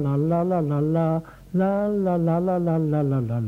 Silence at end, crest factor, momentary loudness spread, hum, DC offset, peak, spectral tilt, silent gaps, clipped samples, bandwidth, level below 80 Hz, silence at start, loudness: 0 s; 12 dB; 3 LU; none; under 0.1%; -10 dBFS; -10.5 dB/octave; none; under 0.1%; 4.1 kHz; -52 dBFS; 0 s; -23 LUFS